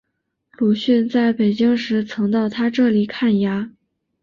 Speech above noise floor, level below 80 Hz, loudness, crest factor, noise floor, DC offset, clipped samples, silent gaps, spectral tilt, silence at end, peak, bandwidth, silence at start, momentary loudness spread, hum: 57 dB; -60 dBFS; -18 LUFS; 12 dB; -74 dBFS; under 0.1%; under 0.1%; none; -7.5 dB/octave; 0.5 s; -6 dBFS; 7 kHz; 0.6 s; 6 LU; none